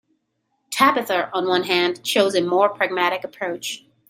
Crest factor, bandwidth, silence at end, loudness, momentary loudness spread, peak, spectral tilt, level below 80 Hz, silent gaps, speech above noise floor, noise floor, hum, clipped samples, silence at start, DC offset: 20 dB; 16 kHz; 0.3 s; -20 LUFS; 10 LU; -2 dBFS; -3 dB/octave; -70 dBFS; none; 52 dB; -72 dBFS; none; under 0.1%; 0.7 s; under 0.1%